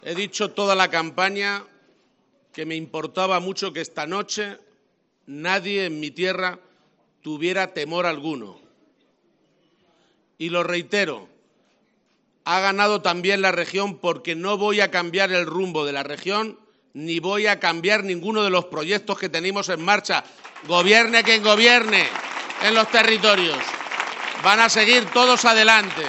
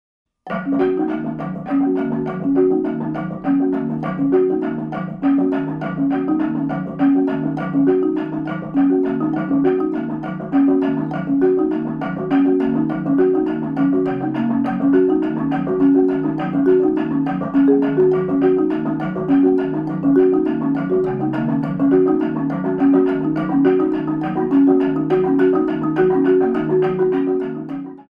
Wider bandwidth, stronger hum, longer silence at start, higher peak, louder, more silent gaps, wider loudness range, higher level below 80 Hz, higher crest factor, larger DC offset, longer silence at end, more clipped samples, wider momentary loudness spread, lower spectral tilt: first, 8.4 kHz vs 3.5 kHz; neither; second, 0.05 s vs 0.45 s; about the same, 0 dBFS vs -2 dBFS; about the same, -19 LUFS vs -18 LUFS; neither; first, 12 LU vs 3 LU; second, -72 dBFS vs -52 dBFS; first, 22 dB vs 14 dB; neither; about the same, 0 s vs 0.05 s; neither; first, 15 LU vs 7 LU; second, -2.5 dB/octave vs -10.5 dB/octave